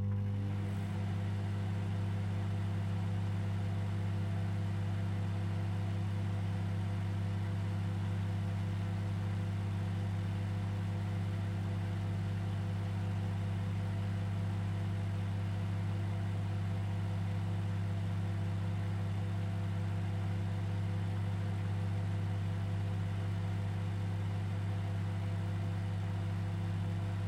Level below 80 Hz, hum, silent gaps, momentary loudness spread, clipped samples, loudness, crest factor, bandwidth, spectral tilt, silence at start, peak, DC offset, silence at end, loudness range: -58 dBFS; 50 Hz at -35 dBFS; none; 1 LU; under 0.1%; -37 LUFS; 8 dB; 9.8 kHz; -8 dB/octave; 0 s; -26 dBFS; under 0.1%; 0 s; 0 LU